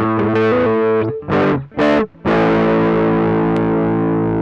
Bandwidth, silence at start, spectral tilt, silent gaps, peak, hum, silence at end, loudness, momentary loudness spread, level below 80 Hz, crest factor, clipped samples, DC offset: 7.2 kHz; 0 s; -8.5 dB/octave; none; -6 dBFS; none; 0 s; -15 LUFS; 3 LU; -40 dBFS; 10 dB; under 0.1%; under 0.1%